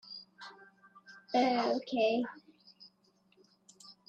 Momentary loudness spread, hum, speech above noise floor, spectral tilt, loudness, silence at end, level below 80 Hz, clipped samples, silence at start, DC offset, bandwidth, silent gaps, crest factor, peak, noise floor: 25 LU; none; 40 dB; -4.5 dB/octave; -32 LUFS; 0.15 s; -82 dBFS; under 0.1%; 0.05 s; under 0.1%; 8.8 kHz; none; 18 dB; -18 dBFS; -70 dBFS